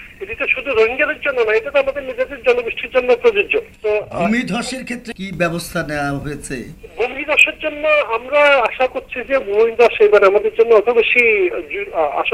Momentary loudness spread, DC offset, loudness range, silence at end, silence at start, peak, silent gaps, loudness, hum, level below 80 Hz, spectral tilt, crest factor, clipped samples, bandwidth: 13 LU; under 0.1%; 7 LU; 0 s; 0 s; -2 dBFS; none; -16 LUFS; none; -44 dBFS; -4.5 dB/octave; 16 dB; under 0.1%; 14.5 kHz